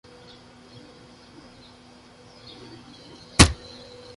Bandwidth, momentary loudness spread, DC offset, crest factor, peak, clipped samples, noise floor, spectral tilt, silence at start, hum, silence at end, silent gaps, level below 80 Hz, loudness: 11.5 kHz; 30 LU; under 0.1%; 28 dB; 0 dBFS; under 0.1%; -50 dBFS; -3.5 dB/octave; 3.4 s; none; 0.65 s; none; -36 dBFS; -19 LUFS